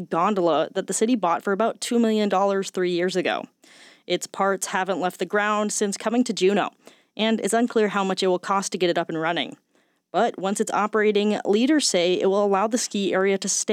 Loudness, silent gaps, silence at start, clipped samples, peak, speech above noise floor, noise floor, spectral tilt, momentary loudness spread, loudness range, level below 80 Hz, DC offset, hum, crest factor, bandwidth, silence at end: -23 LUFS; none; 0 s; under 0.1%; -8 dBFS; 42 dB; -65 dBFS; -3.5 dB/octave; 5 LU; 3 LU; -84 dBFS; under 0.1%; none; 16 dB; 16 kHz; 0 s